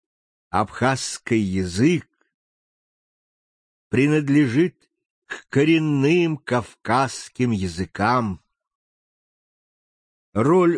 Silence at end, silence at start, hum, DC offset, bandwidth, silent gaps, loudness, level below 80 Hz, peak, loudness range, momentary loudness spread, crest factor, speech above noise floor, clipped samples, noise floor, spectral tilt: 0 s; 0.55 s; none; under 0.1%; 10 kHz; 2.34-3.91 s, 5.10-5.22 s, 8.75-10.33 s; -21 LUFS; -56 dBFS; -4 dBFS; 5 LU; 8 LU; 18 dB; over 70 dB; under 0.1%; under -90 dBFS; -6 dB/octave